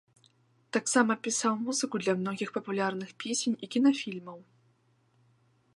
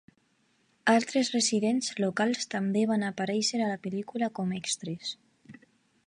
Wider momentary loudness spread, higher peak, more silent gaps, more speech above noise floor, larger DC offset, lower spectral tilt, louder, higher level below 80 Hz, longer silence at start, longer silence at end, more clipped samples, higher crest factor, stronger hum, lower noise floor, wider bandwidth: about the same, 9 LU vs 9 LU; first, -8 dBFS vs -12 dBFS; neither; about the same, 39 dB vs 41 dB; neither; about the same, -3.5 dB/octave vs -4 dB/octave; about the same, -30 LUFS vs -29 LUFS; second, -84 dBFS vs -76 dBFS; about the same, 0.75 s vs 0.85 s; first, 1.35 s vs 0.55 s; neither; first, 24 dB vs 18 dB; neither; about the same, -69 dBFS vs -70 dBFS; about the same, 11.5 kHz vs 11.5 kHz